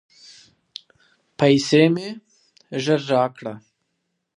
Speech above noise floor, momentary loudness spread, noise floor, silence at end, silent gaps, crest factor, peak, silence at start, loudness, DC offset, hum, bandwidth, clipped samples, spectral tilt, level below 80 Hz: 56 dB; 24 LU; -75 dBFS; 0.8 s; none; 20 dB; -2 dBFS; 1.4 s; -19 LUFS; under 0.1%; none; 11 kHz; under 0.1%; -5.5 dB/octave; -68 dBFS